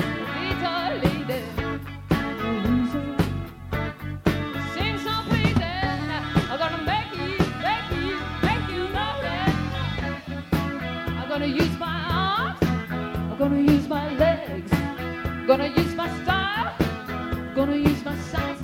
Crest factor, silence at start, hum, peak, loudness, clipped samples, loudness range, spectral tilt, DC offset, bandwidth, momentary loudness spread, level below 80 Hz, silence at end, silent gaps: 20 dB; 0 s; none; -6 dBFS; -25 LUFS; under 0.1%; 3 LU; -6.5 dB/octave; under 0.1%; 16.5 kHz; 8 LU; -38 dBFS; 0 s; none